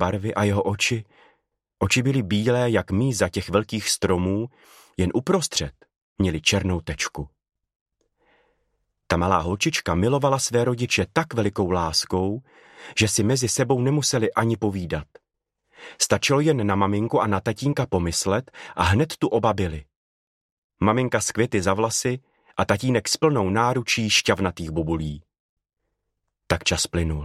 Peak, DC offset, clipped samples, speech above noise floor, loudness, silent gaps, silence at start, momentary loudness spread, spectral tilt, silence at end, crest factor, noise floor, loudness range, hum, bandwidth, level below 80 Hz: -2 dBFS; under 0.1%; under 0.1%; 57 dB; -22 LUFS; 6.02-6.16 s, 7.76-7.86 s, 19.96-20.70 s, 25.40-25.57 s; 0 s; 8 LU; -4.5 dB/octave; 0 s; 22 dB; -79 dBFS; 3 LU; none; 15 kHz; -44 dBFS